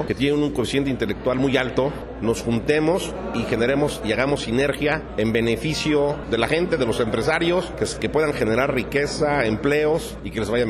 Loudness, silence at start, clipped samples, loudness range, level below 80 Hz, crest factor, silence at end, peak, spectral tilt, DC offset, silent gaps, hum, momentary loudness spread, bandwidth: -22 LUFS; 0 s; under 0.1%; 1 LU; -40 dBFS; 14 dB; 0 s; -8 dBFS; -5.5 dB/octave; under 0.1%; none; none; 4 LU; 13.5 kHz